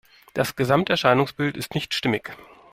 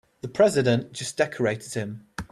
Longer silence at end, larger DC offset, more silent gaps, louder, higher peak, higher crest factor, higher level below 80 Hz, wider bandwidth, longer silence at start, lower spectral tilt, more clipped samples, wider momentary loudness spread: first, 0.3 s vs 0.1 s; neither; neither; about the same, -23 LUFS vs -25 LUFS; about the same, -4 dBFS vs -6 dBFS; about the same, 20 dB vs 18 dB; about the same, -56 dBFS vs -56 dBFS; first, 16 kHz vs 13.5 kHz; about the same, 0.35 s vs 0.25 s; about the same, -5 dB/octave vs -5 dB/octave; neither; second, 10 LU vs 14 LU